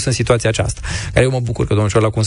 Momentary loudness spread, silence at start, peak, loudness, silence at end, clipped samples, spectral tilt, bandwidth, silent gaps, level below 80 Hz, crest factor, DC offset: 5 LU; 0 s; -2 dBFS; -16 LUFS; 0 s; under 0.1%; -5.5 dB/octave; 11 kHz; none; -30 dBFS; 14 dB; under 0.1%